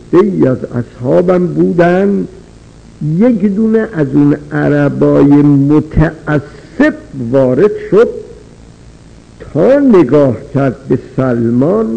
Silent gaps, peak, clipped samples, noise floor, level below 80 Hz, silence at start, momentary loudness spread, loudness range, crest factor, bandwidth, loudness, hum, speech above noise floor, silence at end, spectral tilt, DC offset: none; 0 dBFS; under 0.1%; -37 dBFS; -34 dBFS; 0.1 s; 10 LU; 3 LU; 10 dB; 8.6 kHz; -11 LUFS; none; 27 dB; 0 s; -9.5 dB/octave; under 0.1%